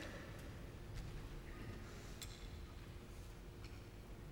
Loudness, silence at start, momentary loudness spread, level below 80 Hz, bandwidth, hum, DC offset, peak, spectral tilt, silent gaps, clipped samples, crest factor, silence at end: -54 LUFS; 0 s; 4 LU; -56 dBFS; 19 kHz; none; under 0.1%; -34 dBFS; -5 dB/octave; none; under 0.1%; 18 dB; 0 s